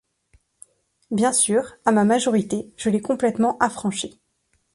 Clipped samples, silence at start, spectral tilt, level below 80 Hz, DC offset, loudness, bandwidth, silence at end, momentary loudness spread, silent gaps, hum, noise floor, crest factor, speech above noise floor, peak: under 0.1%; 1.1 s; -4 dB/octave; -60 dBFS; under 0.1%; -21 LUFS; 11.5 kHz; 0.65 s; 10 LU; none; none; -69 dBFS; 20 dB; 48 dB; -2 dBFS